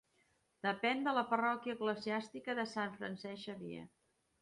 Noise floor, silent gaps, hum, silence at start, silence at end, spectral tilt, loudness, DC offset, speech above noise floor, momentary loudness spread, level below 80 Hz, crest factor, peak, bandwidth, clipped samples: -77 dBFS; none; none; 0.65 s; 0.55 s; -5 dB/octave; -38 LUFS; under 0.1%; 38 dB; 12 LU; -82 dBFS; 20 dB; -20 dBFS; 11.5 kHz; under 0.1%